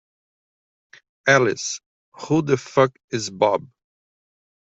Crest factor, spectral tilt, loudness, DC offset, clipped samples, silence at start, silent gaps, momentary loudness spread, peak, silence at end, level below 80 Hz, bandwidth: 20 dB; -4.5 dB/octave; -21 LUFS; under 0.1%; under 0.1%; 1.25 s; 1.86-2.12 s, 3.04-3.08 s; 11 LU; -2 dBFS; 1.05 s; -64 dBFS; 8.2 kHz